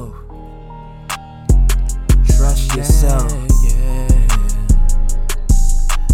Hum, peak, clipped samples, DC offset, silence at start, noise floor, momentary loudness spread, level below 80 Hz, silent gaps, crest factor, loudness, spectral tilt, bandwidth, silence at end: none; -2 dBFS; under 0.1%; under 0.1%; 0 s; -32 dBFS; 20 LU; -12 dBFS; none; 10 dB; -17 LUFS; -5 dB/octave; 15.5 kHz; 0 s